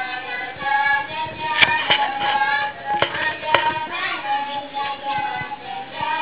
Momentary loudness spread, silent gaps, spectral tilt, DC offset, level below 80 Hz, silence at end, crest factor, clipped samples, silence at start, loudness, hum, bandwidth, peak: 11 LU; none; 1 dB/octave; 0.4%; -54 dBFS; 0 s; 22 dB; under 0.1%; 0 s; -21 LUFS; none; 4 kHz; 0 dBFS